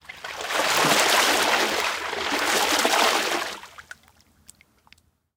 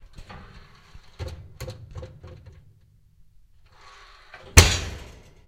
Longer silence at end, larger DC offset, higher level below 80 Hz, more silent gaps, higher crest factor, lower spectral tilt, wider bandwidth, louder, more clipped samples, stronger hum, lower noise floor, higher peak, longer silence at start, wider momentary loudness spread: first, 1.55 s vs 0.45 s; neither; second, -62 dBFS vs -34 dBFS; neither; second, 22 dB vs 28 dB; second, -0.5 dB/octave vs -3 dB/octave; first, 18 kHz vs 16 kHz; about the same, -21 LUFS vs -19 LUFS; neither; neither; about the same, -59 dBFS vs -57 dBFS; about the same, -2 dBFS vs 0 dBFS; about the same, 0.1 s vs 0.2 s; second, 15 LU vs 30 LU